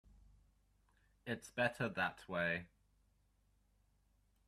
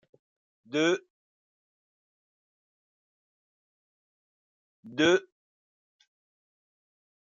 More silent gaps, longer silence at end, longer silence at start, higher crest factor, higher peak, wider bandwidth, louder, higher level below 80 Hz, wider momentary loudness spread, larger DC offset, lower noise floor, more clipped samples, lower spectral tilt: second, none vs 1.10-4.83 s; second, 1.8 s vs 2 s; first, 1.25 s vs 0.7 s; about the same, 24 dB vs 24 dB; second, -20 dBFS vs -10 dBFS; first, 14.5 kHz vs 7.6 kHz; second, -40 LUFS vs -27 LUFS; first, -72 dBFS vs -78 dBFS; about the same, 9 LU vs 10 LU; neither; second, -76 dBFS vs under -90 dBFS; neither; about the same, -5 dB/octave vs -4 dB/octave